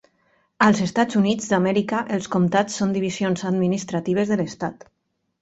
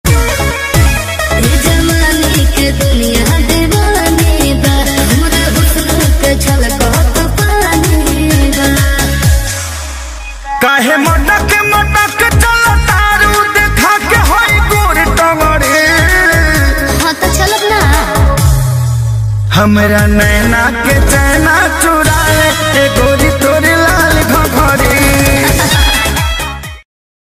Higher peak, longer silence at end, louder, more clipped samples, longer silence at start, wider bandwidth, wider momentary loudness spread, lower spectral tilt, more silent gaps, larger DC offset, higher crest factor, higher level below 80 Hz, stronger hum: second, -4 dBFS vs 0 dBFS; first, 0.7 s vs 0.5 s; second, -22 LUFS vs -9 LUFS; neither; first, 0.6 s vs 0.05 s; second, 8.2 kHz vs 16 kHz; about the same, 6 LU vs 4 LU; first, -5.5 dB/octave vs -4 dB/octave; neither; neither; first, 18 dB vs 8 dB; second, -58 dBFS vs -14 dBFS; neither